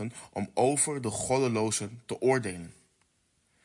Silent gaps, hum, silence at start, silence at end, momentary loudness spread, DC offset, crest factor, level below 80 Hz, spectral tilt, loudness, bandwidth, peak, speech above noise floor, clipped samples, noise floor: none; none; 0 s; 0.9 s; 12 LU; under 0.1%; 18 dB; -66 dBFS; -4.5 dB/octave; -29 LUFS; 11.5 kHz; -12 dBFS; 42 dB; under 0.1%; -72 dBFS